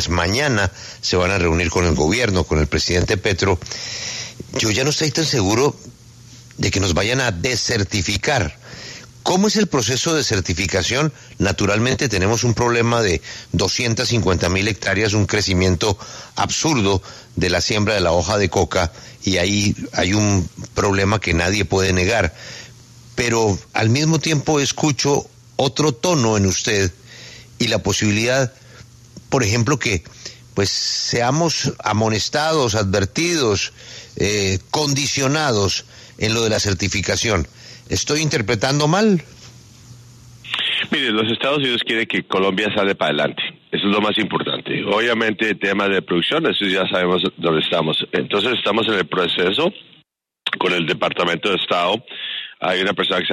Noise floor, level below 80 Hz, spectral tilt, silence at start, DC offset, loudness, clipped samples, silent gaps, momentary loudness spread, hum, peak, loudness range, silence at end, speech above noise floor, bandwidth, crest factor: -58 dBFS; -40 dBFS; -4 dB/octave; 0 s; under 0.1%; -18 LUFS; under 0.1%; none; 7 LU; none; -2 dBFS; 2 LU; 0 s; 40 dB; 13.5 kHz; 16 dB